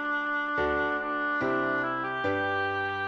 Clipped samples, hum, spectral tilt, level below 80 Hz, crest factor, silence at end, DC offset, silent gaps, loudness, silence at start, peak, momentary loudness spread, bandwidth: under 0.1%; none; -6.5 dB/octave; -56 dBFS; 12 dB; 0 s; under 0.1%; none; -28 LUFS; 0 s; -16 dBFS; 2 LU; 7.6 kHz